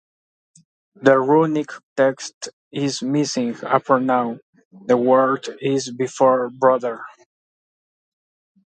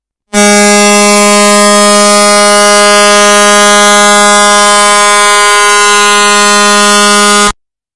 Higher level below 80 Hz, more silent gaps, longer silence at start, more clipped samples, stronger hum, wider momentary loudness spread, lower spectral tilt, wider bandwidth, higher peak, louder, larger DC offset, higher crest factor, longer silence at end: second, -72 dBFS vs -38 dBFS; first, 1.83-1.96 s, 2.34-2.41 s, 2.53-2.71 s, 4.42-4.53 s, 4.65-4.71 s vs none; first, 1 s vs 0 s; second, under 0.1% vs 10%; neither; first, 15 LU vs 1 LU; first, -5 dB/octave vs -1.5 dB/octave; second, 9.2 kHz vs 12 kHz; about the same, 0 dBFS vs 0 dBFS; second, -19 LUFS vs -3 LUFS; second, under 0.1% vs 4%; first, 20 dB vs 4 dB; first, 1.6 s vs 0 s